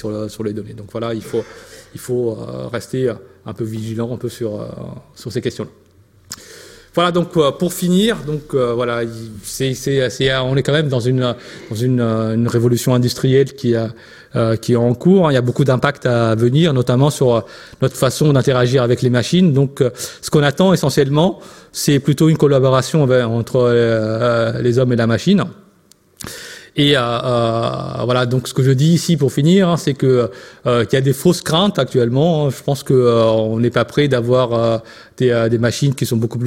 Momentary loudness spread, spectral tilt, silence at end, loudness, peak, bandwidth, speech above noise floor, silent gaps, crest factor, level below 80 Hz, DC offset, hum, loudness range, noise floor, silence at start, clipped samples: 13 LU; -6 dB/octave; 0 s; -16 LUFS; 0 dBFS; 16.5 kHz; 36 dB; none; 16 dB; -48 dBFS; under 0.1%; none; 9 LU; -52 dBFS; 0.05 s; under 0.1%